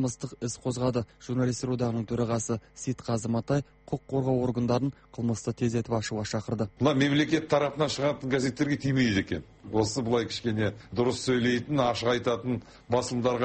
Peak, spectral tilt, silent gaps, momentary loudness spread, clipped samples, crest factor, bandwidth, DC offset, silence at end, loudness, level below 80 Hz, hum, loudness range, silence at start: -12 dBFS; -5.5 dB/octave; none; 8 LU; under 0.1%; 16 dB; 8.8 kHz; under 0.1%; 0 s; -29 LUFS; -54 dBFS; none; 3 LU; 0 s